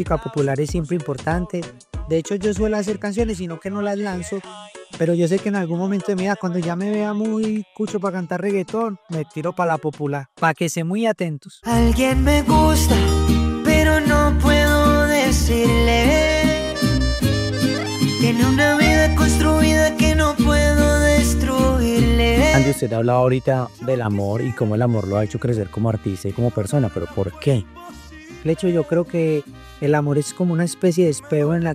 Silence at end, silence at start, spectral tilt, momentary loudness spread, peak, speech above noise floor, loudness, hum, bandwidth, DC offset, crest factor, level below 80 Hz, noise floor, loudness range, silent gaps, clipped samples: 0 s; 0 s; -5.5 dB/octave; 10 LU; -2 dBFS; 20 dB; -19 LUFS; none; 15.5 kHz; under 0.1%; 16 dB; -28 dBFS; -38 dBFS; 7 LU; none; under 0.1%